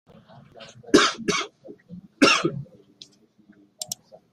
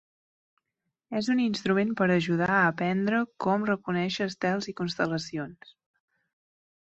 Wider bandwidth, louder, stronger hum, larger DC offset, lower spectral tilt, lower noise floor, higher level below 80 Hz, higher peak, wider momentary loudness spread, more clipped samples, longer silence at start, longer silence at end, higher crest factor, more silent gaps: first, 15 kHz vs 8.2 kHz; first, -21 LUFS vs -27 LUFS; neither; neither; second, -3 dB/octave vs -6 dB/octave; second, -57 dBFS vs -84 dBFS; about the same, -62 dBFS vs -66 dBFS; first, -2 dBFS vs -10 dBFS; first, 24 LU vs 9 LU; neither; second, 0.6 s vs 1.1 s; second, 0.5 s vs 1.3 s; first, 24 dB vs 18 dB; neither